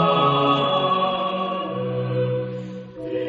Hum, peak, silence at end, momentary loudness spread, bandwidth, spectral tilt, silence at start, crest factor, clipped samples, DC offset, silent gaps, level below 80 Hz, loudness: none; -6 dBFS; 0 s; 13 LU; 7.4 kHz; -4 dB/octave; 0 s; 16 dB; under 0.1%; under 0.1%; none; -60 dBFS; -22 LUFS